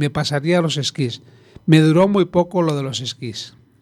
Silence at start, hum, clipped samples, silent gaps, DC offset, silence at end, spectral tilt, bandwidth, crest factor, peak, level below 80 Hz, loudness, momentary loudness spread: 0 s; none; under 0.1%; none; under 0.1%; 0.35 s; -6 dB/octave; 12.5 kHz; 18 dB; 0 dBFS; -54 dBFS; -18 LUFS; 15 LU